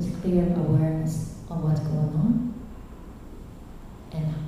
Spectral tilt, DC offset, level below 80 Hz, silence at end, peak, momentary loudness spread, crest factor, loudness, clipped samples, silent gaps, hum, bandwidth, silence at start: -9 dB/octave; under 0.1%; -42 dBFS; 0 s; -10 dBFS; 21 LU; 16 dB; -26 LUFS; under 0.1%; none; none; 12.5 kHz; 0 s